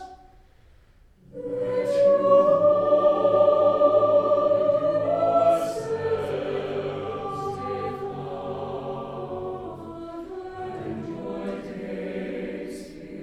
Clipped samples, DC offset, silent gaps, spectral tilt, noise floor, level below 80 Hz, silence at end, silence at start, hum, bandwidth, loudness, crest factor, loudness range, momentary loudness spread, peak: under 0.1%; under 0.1%; none; -7 dB/octave; -55 dBFS; -56 dBFS; 0 s; 0 s; none; 10.5 kHz; -24 LUFS; 16 dB; 14 LU; 17 LU; -8 dBFS